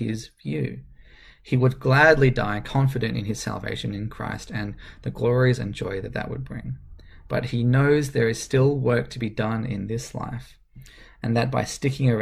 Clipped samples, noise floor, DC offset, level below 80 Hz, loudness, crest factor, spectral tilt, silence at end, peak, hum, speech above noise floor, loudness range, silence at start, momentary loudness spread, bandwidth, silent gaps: under 0.1%; -49 dBFS; under 0.1%; -44 dBFS; -24 LUFS; 20 dB; -6.5 dB/octave; 0 s; -4 dBFS; none; 26 dB; 5 LU; 0 s; 14 LU; 13 kHz; none